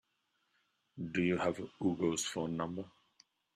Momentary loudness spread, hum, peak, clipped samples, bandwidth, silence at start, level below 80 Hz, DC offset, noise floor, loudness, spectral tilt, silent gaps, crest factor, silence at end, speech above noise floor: 13 LU; none; -20 dBFS; under 0.1%; 13.5 kHz; 0.95 s; -72 dBFS; under 0.1%; -80 dBFS; -36 LUFS; -4.5 dB/octave; none; 18 dB; 0.65 s; 45 dB